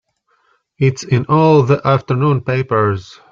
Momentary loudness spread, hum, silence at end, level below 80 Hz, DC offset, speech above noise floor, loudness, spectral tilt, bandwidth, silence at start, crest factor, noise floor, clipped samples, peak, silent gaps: 7 LU; none; 0.3 s; -50 dBFS; under 0.1%; 47 dB; -14 LUFS; -7.5 dB/octave; 7.4 kHz; 0.8 s; 14 dB; -61 dBFS; under 0.1%; -2 dBFS; none